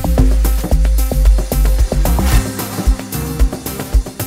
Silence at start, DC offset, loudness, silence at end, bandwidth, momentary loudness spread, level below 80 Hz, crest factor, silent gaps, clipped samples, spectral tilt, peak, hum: 0 s; under 0.1%; -16 LUFS; 0 s; 16.5 kHz; 5 LU; -14 dBFS; 12 dB; none; under 0.1%; -5.5 dB/octave; 0 dBFS; none